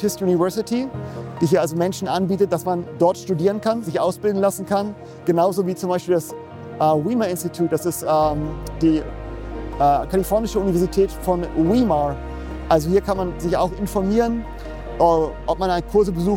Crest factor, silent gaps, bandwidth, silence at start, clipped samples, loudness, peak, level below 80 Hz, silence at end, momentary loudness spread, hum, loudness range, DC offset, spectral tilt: 16 dB; none; 17 kHz; 0 s; under 0.1%; -21 LUFS; -4 dBFS; -36 dBFS; 0 s; 12 LU; none; 1 LU; under 0.1%; -6.5 dB/octave